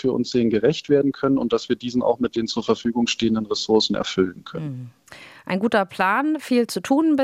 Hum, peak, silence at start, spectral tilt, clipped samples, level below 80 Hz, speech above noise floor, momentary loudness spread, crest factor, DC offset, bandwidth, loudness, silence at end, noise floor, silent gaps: none; -6 dBFS; 0.05 s; -5 dB/octave; under 0.1%; -56 dBFS; 24 dB; 10 LU; 16 dB; under 0.1%; 14.5 kHz; -21 LUFS; 0 s; -45 dBFS; none